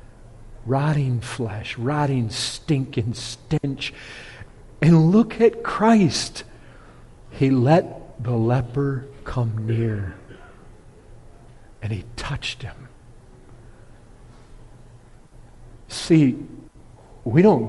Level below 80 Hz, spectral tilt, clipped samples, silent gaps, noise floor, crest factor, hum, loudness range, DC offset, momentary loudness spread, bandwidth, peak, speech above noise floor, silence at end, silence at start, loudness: -46 dBFS; -6.5 dB/octave; under 0.1%; none; -47 dBFS; 18 dB; none; 14 LU; under 0.1%; 19 LU; 11.5 kHz; -4 dBFS; 26 dB; 0 s; 0.35 s; -21 LUFS